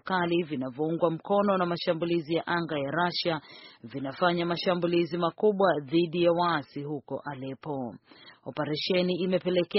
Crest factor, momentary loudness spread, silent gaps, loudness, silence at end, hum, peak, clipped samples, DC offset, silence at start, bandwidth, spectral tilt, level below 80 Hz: 18 dB; 12 LU; none; -28 LUFS; 0 s; none; -10 dBFS; under 0.1%; under 0.1%; 0.05 s; 5.8 kHz; -4 dB/octave; -68 dBFS